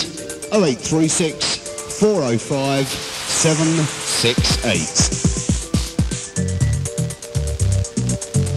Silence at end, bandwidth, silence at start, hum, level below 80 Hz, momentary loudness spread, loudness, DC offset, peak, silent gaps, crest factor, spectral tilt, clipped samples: 0 s; 14 kHz; 0 s; none; -32 dBFS; 8 LU; -19 LUFS; under 0.1%; -2 dBFS; none; 16 dB; -4 dB/octave; under 0.1%